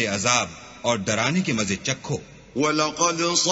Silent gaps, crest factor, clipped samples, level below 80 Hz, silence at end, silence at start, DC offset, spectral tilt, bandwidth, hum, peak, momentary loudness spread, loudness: none; 20 dB; under 0.1%; -56 dBFS; 0 s; 0 s; under 0.1%; -3 dB/octave; 8 kHz; none; -4 dBFS; 11 LU; -23 LUFS